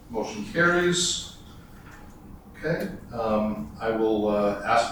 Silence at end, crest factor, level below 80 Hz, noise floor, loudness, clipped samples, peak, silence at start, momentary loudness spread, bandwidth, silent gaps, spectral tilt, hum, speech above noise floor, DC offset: 0 s; 16 dB; -48 dBFS; -45 dBFS; -25 LUFS; under 0.1%; -10 dBFS; 0.05 s; 19 LU; over 20 kHz; none; -4 dB/octave; none; 20 dB; under 0.1%